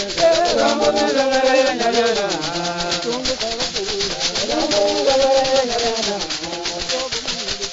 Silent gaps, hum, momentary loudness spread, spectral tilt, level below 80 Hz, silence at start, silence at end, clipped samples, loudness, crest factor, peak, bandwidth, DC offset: none; none; 7 LU; -2 dB/octave; -44 dBFS; 0 s; 0 s; under 0.1%; -18 LUFS; 14 dB; -4 dBFS; 8 kHz; under 0.1%